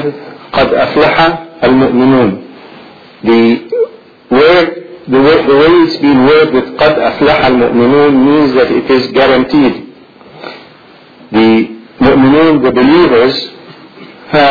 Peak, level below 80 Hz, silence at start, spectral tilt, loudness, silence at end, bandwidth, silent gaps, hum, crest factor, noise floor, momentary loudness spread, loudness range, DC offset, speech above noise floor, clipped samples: 0 dBFS; -38 dBFS; 0 s; -7.5 dB/octave; -8 LUFS; 0 s; 5.4 kHz; none; none; 8 dB; -38 dBFS; 11 LU; 4 LU; under 0.1%; 31 dB; 0.2%